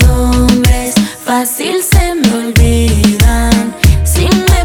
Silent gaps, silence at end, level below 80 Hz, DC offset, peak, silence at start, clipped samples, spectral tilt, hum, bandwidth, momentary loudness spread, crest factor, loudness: none; 0 s; -12 dBFS; under 0.1%; 0 dBFS; 0 s; under 0.1%; -5 dB/octave; none; over 20 kHz; 4 LU; 8 dB; -10 LUFS